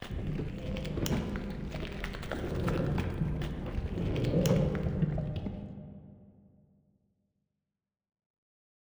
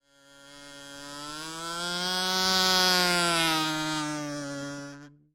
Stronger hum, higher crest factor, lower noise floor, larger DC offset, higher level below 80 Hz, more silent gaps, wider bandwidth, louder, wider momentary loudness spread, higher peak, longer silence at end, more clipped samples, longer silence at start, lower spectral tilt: neither; about the same, 20 dB vs 20 dB; first, -90 dBFS vs -55 dBFS; neither; first, -42 dBFS vs -60 dBFS; neither; first, over 20 kHz vs 16.5 kHz; second, -34 LUFS vs -26 LUFS; second, 10 LU vs 21 LU; second, -14 dBFS vs -10 dBFS; first, 2.6 s vs 0.25 s; neither; second, 0 s vs 0.35 s; first, -7 dB/octave vs -2 dB/octave